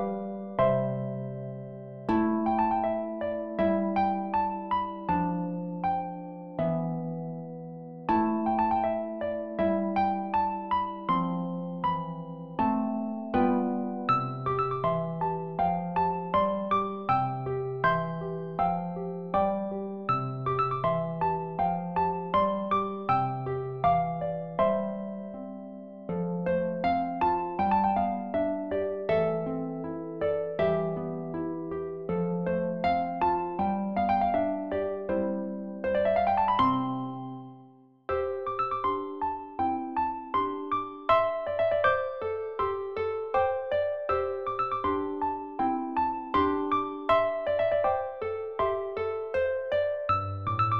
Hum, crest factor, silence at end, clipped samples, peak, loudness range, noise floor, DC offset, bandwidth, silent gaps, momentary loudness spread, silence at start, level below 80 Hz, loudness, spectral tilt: none; 18 dB; 0 s; under 0.1%; -10 dBFS; 3 LU; -55 dBFS; 0.2%; 5.8 kHz; none; 8 LU; 0 s; -58 dBFS; -29 LUFS; -9.5 dB/octave